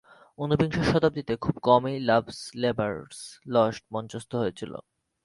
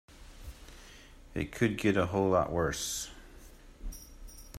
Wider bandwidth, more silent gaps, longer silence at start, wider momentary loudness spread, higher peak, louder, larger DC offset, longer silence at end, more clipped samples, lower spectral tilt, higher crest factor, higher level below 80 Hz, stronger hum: second, 11.5 kHz vs 16 kHz; neither; first, 0.4 s vs 0.1 s; second, 16 LU vs 23 LU; first, -6 dBFS vs -14 dBFS; first, -26 LUFS vs -31 LUFS; neither; first, 0.45 s vs 0 s; neither; first, -6.5 dB/octave vs -5 dB/octave; about the same, 20 dB vs 20 dB; about the same, -52 dBFS vs -50 dBFS; neither